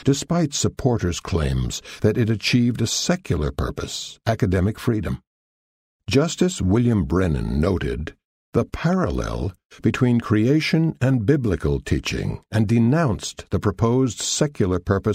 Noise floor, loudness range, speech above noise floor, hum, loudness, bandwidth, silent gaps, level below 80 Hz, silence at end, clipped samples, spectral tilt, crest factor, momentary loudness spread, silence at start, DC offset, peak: under -90 dBFS; 3 LU; over 69 dB; none; -22 LUFS; 15.5 kHz; 5.27-6.00 s, 8.25-8.52 s, 9.65-9.70 s; -36 dBFS; 0 s; under 0.1%; -5.5 dB/octave; 16 dB; 9 LU; 0 s; under 0.1%; -4 dBFS